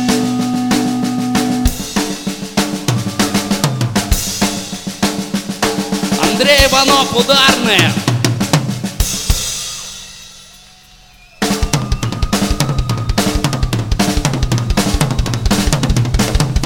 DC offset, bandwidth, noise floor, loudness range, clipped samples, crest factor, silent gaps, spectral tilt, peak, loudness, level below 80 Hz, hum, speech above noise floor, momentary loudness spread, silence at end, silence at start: under 0.1%; 19.5 kHz; -42 dBFS; 8 LU; under 0.1%; 14 dB; none; -4 dB/octave; 0 dBFS; -15 LUFS; -24 dBFS; none; 32 dB; 10 LU; 0 s; 0 s